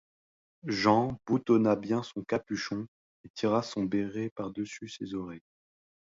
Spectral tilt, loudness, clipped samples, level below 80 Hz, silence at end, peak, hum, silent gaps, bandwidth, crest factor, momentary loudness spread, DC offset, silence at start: -6 dB/octave; -31 LUFS; under 0.1%; -64 dBFS; 0.75 s; -10 dBFS; none; 2.88-3.24 s, 3.30-3.34 s, 4.31-4.36 s; 7.8 kHz; 22 dB; 15 LU; under 0.1%; 0.65 s